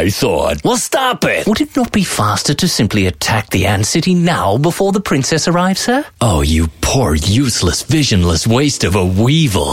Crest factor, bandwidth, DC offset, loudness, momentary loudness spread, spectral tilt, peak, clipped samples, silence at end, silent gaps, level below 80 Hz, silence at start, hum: 10 dB; 16.5 kHz; under 0.1%; -13 LUFS; 3 LU; -4.5 dB/octave; -2 dBFS; under 0.1%; 0 s; none; -28 dBFS; 0 s; none